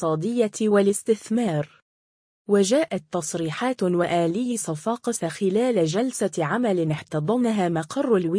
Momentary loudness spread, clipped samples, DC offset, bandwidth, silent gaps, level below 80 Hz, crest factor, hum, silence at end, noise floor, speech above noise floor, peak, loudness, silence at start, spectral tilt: 7 LU; under 0.1%; under 0.1%; 10.5 kHz; 1.82-2.45 s; -66 dBFS; 16 dB; none; 0 s; under -90 dBFS; over 67 dB; -8 dBFS; -23 LUFS; 0 s; -5.5 dB/octave